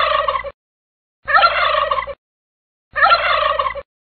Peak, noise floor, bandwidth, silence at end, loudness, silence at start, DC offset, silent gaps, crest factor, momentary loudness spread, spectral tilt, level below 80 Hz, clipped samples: -2 dBFS; under -90 dBFS; 4.6 kHz; 0.3 s; -16 LUFS; 0 s; 0.2%; 0.54-1.23 s, 2.18-2.91 s; 16 dB; 19 LU; 2.5 dB/octave; -44 dBFS; under 0.1%